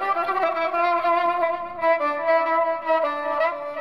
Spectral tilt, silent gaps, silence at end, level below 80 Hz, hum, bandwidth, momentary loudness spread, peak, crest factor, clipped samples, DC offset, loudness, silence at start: -4.5 dB/octave; none; 0 s; -64 dBFS; none; 11.5 kHz; 4 LU; -10 dBFS; 12 dB; under 0.1%; 0.3%; -22 LUFS; 0 s